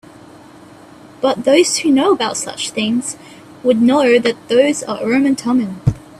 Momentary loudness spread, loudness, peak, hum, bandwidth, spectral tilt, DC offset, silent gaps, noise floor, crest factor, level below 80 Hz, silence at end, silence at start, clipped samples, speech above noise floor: 9 LU; -15 LUFS; 0 dBFS; none; 14 kHz; -4.5 dB/octave; under 0.1%; none; -40 dBFS; 16 dB; -44 dBFS; 0.2 s; 1.2 s; under 0.1%; 26 dB